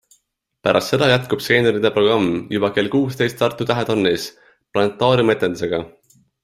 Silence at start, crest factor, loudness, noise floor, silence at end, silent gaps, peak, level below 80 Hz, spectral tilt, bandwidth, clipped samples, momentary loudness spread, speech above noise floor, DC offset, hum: 0.65 s; 18 dB; -18 LUFS; -66 dBFS; 0.55 s; none; -2 dBFS; -54 dBFS; -5.5 dB/octave; 15.5 kHz; under 0.1%; 8 LU; 49 dB; under 0.1%; none